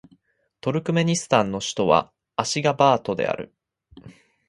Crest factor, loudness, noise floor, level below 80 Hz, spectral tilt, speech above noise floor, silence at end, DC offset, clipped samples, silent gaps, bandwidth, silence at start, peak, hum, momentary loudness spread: 22 dB; -22 LUFS; -64 dBFS; -58 dBFS; -4.5 dB/octave; 43 dB; 0.35 s; under 0.1%; under 0.1%; none; 11.5 kHz; 0.65 s; 0 dBFS; none; 12 LU